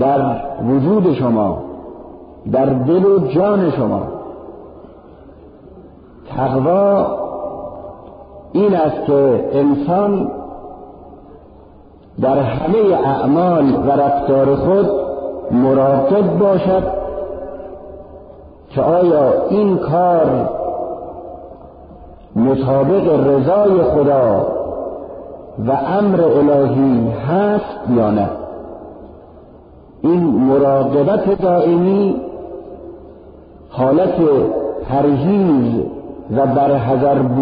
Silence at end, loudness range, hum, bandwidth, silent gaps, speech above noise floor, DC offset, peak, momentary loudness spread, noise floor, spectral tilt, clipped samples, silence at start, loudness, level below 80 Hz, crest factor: 0 s; 5 LU; none; 5 kHz; none; 29 dB; under 0.1%; -4 dBFS; 19 LU; -42 dBFS; -8.5 dB/octave; under 0.1%; 0 s; -15 LUFS; -42 dBFS; 12 dB